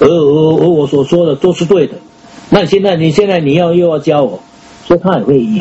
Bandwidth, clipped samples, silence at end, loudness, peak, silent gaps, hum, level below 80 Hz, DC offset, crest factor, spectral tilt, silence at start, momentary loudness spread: 8.2 kHz; 0.3%; 0 s; -10 LUFS; 0 dBFS; none; none; -42 dBFS; under 0.1%; 10 dB; -7 dB/octave; 0 s; 4 LU